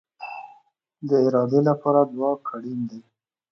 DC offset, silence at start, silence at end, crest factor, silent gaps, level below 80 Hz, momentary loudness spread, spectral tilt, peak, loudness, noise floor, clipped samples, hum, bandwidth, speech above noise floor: under 0.1%; 0.2 s; 0.5 s; 20 dB; none; -74 dBFS; 17 LU; -9.5 dB/octave; -4 dBFS; -22 LUFS; -58 dBFS; under 0.1%; none; 6.4 kHz; 37 dB